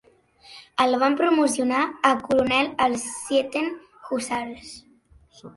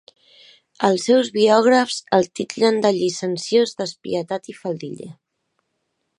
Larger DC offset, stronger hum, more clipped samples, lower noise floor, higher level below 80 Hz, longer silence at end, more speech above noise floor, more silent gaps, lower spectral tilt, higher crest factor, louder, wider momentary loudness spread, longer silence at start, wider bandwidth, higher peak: neither; neither; neither; second, -55 dBFS vs -74 dBFS; first, -60 dBFS vs -70 dBFS; second, 0.05 s vs 1.05 s; second, 33 dB vs 55 dB; neither; second, -3 dB/octave vs -4.5 dB/octave; about the same, 20 dB vs 20 dB; second, -23 LUFS vs -19 LUFS; second, 11 LU vs 14 LU; second, 0.5 s vs 0.8 s; about the same, 12 kHz vs 11 kHz; about the same, -4 dBFS vs -2 dBFS